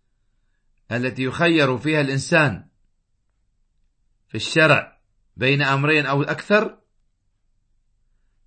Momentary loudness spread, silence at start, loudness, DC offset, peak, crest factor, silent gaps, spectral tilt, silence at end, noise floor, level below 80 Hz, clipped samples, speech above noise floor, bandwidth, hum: 11 LU; 0.9 s; -19 LUFS; under 0.1%; -2 dBFS; 22 dB; none; -5.5 dB/octave; 1.75 s; -67 dBFS; -58 dBFS; under 0.1%; 48 dB; 8.8 kHz; none